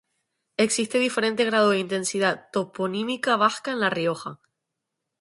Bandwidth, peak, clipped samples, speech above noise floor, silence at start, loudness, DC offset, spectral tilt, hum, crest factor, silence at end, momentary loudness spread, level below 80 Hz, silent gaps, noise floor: 11.5 kHz; -6 dBFS; under 0.1%; 59 dB; 0.6 s; -24 LUFS; under 0.1%; -3.5 dB/octave; none; 18 dB; 0.85 s; 8 LU; -72 dBFS; none; -83 dBFS